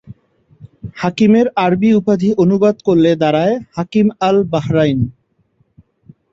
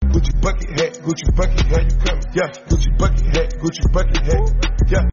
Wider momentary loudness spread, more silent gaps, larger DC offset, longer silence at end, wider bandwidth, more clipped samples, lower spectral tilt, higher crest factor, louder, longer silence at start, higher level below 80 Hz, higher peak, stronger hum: first, 9 LU vs 4 LU; neither; neither; first, 1.2 s vs 0 s; about the same, 7.6 kHz vs 7.4 kHz; neither; first, -8 dB/octave vs -5.5 dB/octave; about the same, 14 dB vs 10 dB; first, -14 LUFS vs -19 LUFS; about the same, 0.1 s vs 0 s; second, -48 dBFS vs -16 dBFS; about the same, -2 dBFS vs -4 dBFS; neither